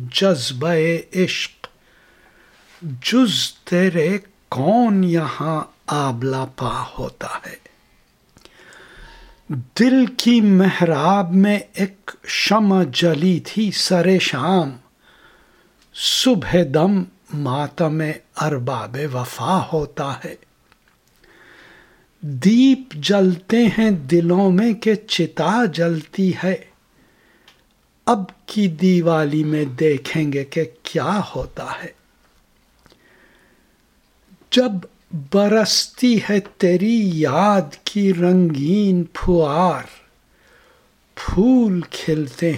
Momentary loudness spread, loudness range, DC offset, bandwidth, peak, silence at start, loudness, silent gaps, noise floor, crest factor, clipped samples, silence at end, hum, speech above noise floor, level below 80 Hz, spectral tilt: 13 LU; 9 LU; under 0.1%; 16 kHz; 0 dBFS; 0 s; -18 LUFS; none; -59 dBFS; 20 dB; under 0.1%; 0 s; none; 41 dB; -44 dBFS; -5.5 dB/octave